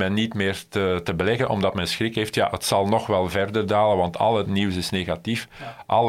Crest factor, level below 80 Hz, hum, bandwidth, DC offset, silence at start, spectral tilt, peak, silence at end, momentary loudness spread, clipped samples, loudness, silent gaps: 18 dB; -50 dBFS; none; 16.5 kHz; under 0.1%; 0 s; -5 dB/octave; -4 dBFS; 0 s; 5 LU; under 0.1%; -23 LUFS; none